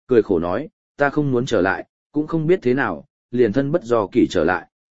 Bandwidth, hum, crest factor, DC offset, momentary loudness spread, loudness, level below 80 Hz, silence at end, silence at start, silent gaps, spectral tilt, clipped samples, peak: 8 kHz; none; 18 dB; 0.8%; 10 LU; -20 LUFS; -50 dBFS; 0.2 s; 0.05 s; 0.73-0.95 s, 1.89-2.10 s, 3.10-3.29 s; -7 dB/octave; under 0.1%; -2 dBFS